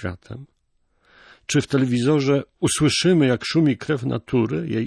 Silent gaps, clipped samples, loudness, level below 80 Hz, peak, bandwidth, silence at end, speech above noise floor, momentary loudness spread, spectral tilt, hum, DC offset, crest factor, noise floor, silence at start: none; under 0.1%; -20 LUFS; -52 dBFS; -8 dBFS; 11 kHz; 0 s; 46 dB; 16 LU; -5.5 dB/octave; none; under 0.1%; 14 dB; -66 dBFS; 0 s